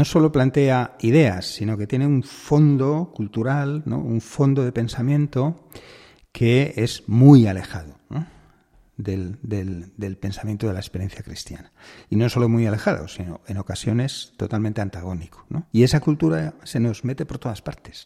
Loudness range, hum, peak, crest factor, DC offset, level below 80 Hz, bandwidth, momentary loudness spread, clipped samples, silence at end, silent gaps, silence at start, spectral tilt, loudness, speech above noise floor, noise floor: 11 LU; none; -2 dBFS; 20 dB; under 0.1%; -48 dBFS; 13.5 kHz; 15 LU; under 0.1%; 0.05 s; none; 0 s; -7.5 dB/octave; -21 LUFS; 36 dB; -56 dBFS